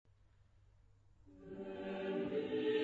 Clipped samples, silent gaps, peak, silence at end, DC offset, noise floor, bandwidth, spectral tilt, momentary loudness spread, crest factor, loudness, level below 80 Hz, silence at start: under 0.1%; none; -26 dBFS; 0 s; under 0.1%; -68 dBFS; 7.4 kHz; -4.5 dB/octave; 15 LU; 16 dB; -41 LUFS; -72 dBFS; 1.25 s